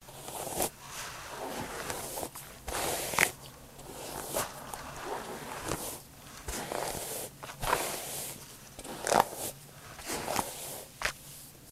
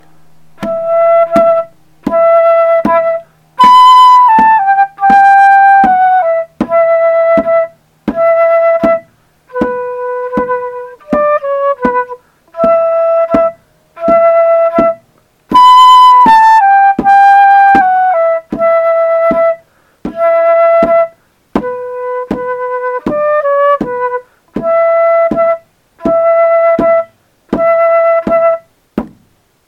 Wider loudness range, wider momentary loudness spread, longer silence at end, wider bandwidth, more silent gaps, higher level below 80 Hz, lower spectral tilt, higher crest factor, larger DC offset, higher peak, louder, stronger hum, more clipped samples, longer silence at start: second, 4 LU vs 8 LU; about the same, 16 LU vs 15 LU; second, 0 s vs 0.6 s; first, 16 kHz vs 12 kHz; neither; second, -54 dBFS vs -44 dBFS; second, -2 dB/octave vs -5 dB/octave; first, 34 dB vs 8 dB; neither; about the same, -2 dBFS vs 0 dBFS; second, -35 LUFS vs -8 LUFS; neither; second, under 0.1% vs 2%; second, 0 s vs 0.6 s